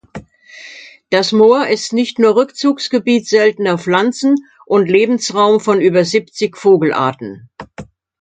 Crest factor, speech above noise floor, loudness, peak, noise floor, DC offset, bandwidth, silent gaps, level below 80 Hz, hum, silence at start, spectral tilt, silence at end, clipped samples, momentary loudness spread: 14 dB; 25 dB; -13 LUFS; 0 dBFS; -38 dBFS; under 0.1%; 9.2 kHz; none; -56 dBFS; none; 0.15 s; -5 dB/octave; 0.4 s; under 0.1%; 22 LU